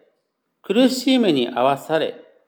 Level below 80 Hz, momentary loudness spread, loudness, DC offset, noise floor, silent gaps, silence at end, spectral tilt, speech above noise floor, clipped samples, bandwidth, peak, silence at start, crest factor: -80 dBFS; 6 LU; -19 LUFS; under 0.1%; -73 dBFS; none; 0.3 s; -4.5 dB/octave; 54 dB; under 0.1%; 19.5 kHz; -4 dBFS; 0.7 s; 16 dB